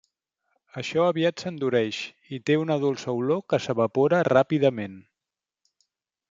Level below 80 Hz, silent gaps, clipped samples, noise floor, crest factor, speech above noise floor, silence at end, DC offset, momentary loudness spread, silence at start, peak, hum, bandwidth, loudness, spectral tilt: -70 dBFS; none; under 0.1%; -89 dBFS; 20 dB; 65 dB; 1.3 s; under 0.1%; 14 LU; 0.75 s; -4 dBFS; none; 7.6 kHz; -24 LUFS; -6.5 dB/octave